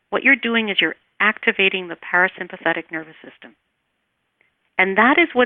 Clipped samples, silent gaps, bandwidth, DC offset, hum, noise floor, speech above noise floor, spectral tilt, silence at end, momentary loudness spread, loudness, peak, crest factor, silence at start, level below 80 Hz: under 0.1%; none; 4.3 kHz; under 0.1%; none; -72 dBFS; 53 dB; -7.5 dB/octave; 0 s; 12 LU; -18 LUFS; -2 dBFS; 18 dB; 0.1 s; -64 dBFS